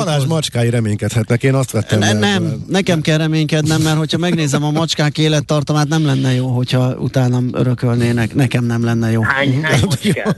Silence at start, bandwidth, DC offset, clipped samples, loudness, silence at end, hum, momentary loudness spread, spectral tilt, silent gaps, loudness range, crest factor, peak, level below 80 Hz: 0 s; 12.5 kHz; under 0.1%; under 0.1%; -15 LUFS; 0 s; none; 3 LU; -5.5 dB/octave; none; 1 LU; 12 dB; -2 dBFS; -44 dBFS